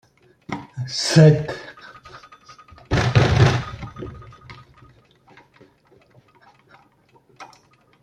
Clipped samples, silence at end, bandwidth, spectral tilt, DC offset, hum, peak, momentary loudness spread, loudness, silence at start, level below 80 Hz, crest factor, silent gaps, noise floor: under 0.1%; 0.6 s; 9.6 kHz; -6 dB/octave; under 0.1%; none; -2 dBFS; 29 LU; -18 LUFS; 0.5 s; -42 dBFS; 20 dB; none; -57 dBFS